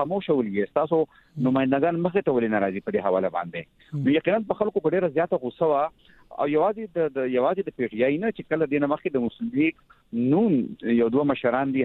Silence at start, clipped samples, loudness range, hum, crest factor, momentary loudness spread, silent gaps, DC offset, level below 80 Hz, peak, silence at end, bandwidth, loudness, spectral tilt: 0 s; under 0.1%; 1 LU; none; 16 dB; 6 LU; none; under 0.1%; -62 dBFS; -8 dBFS; 0 s; 4.2 kHz; -24 LUFS; -10 dB/octave